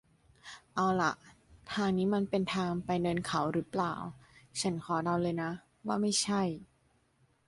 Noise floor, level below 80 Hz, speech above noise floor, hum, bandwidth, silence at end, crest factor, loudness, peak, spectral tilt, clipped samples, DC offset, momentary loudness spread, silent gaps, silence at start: -71 dBFS; -64 dBFS; 39 dB; none; 11.5 kHz; 0.85 s; 16 dB; -33 LUFS; -16 dBFS; -5 dB/octave; under 0.1%; under 0.1%; 12 LU; none; 0.45 s